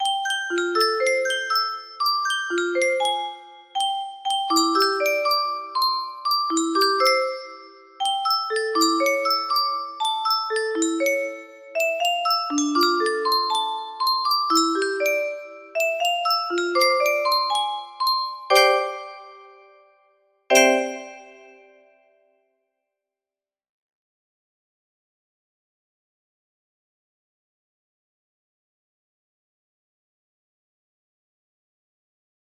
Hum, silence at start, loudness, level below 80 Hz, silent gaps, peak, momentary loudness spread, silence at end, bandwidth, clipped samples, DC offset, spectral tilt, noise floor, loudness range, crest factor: none; 0 s; -21 LUFS; -76 dBFS; none; -2 dBFS; 10 LU; 11.2 s; 15.5 kHz; under 0.1%; under 0.1%; 0.5 dB/octave; under -90 dBFS; 3 LU; 22 dB